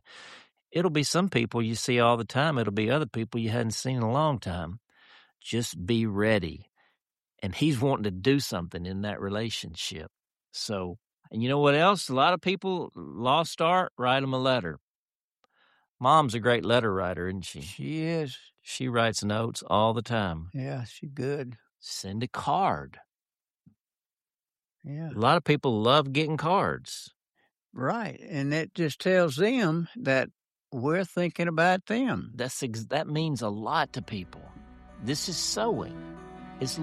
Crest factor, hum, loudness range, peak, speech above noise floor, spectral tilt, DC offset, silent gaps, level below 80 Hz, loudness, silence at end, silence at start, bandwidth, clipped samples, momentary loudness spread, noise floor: 22 dB; none; 5 LU; -6 dBFS; over 63 dB; -5 dB/octave; under 0.1%; 13.91-13.97 s, 14.81-15.08 s, 15.15-15.35 s, 15.89-15.95 s, 23.81-23.85 s; -60 dBFS; -27 LUFS; 0 s; 0.1 s; 13.5 kHz; under 0.1%; 15 LU; under -90 dBFS